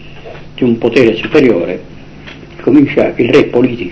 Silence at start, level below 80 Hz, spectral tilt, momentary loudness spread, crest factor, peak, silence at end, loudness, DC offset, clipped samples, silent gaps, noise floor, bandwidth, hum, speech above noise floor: 0 s; -40 dBFS; -7.5 dB/octave; 22 LU; 12 dB; 0 dBFS; 0 s; -11 LUFS; under 0.1%; 2%; none; -31 dBFS; 8 kHz; none; 21 dB